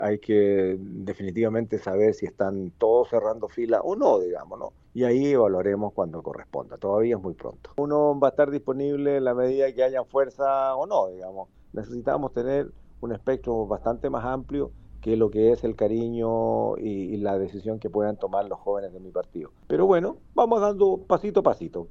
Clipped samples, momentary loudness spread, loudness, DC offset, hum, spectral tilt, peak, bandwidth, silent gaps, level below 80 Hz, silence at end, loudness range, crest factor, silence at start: under 0.1%; 13 LU; -25 LUFS; under 0.1%; none; -8.5 dB/octave; -4 dBFS; 7.2 kHz; none; -52 dBFS; 0 s; 5 LU; 20 dB; 0 s